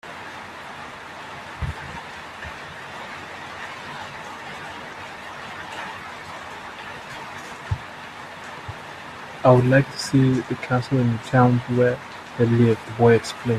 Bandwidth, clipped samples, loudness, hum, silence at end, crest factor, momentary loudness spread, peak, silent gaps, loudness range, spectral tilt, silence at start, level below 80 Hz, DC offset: 13 kHz; under 0.1%; -22 LUFS; none; 0 s; 22 dB; 18 LU; -2 dBFS; none; 14 LU; -7 dB/octave; 0.05 s; -50 dBFS; under 0.1%